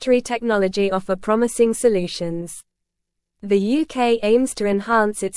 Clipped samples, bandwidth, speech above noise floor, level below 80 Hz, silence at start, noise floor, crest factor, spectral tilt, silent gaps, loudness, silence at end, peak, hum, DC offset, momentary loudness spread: under 0.1%; 12 kHz; 59 dB; -50 dBFS; 0 s; -79 dBFS; 16 dB; -5 dB/octave; none; -20 LUFS; 0 s; -4 dBFS; none; under 0.1%; 10 LU